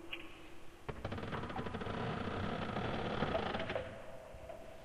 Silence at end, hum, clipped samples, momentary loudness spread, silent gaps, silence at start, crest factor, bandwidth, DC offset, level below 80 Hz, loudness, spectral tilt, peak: 0 s; none; under 0.1%; 14 LU; none; 0 s; 20 dB; 15 kHz; under 0.1%; -56 dBFS; -41 LUFS; -6.5 dB/octave; -22 dBFS